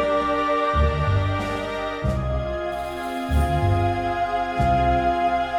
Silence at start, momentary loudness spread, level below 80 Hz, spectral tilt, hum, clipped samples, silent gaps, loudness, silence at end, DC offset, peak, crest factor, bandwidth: 0 s; 7 LU; -30 dBFS; -7 dB/octave; none; under 0.1%; none; -23 LUFS; 0 s; under 0.1%; -8 dBFS; 14 dB; 14.5 kHz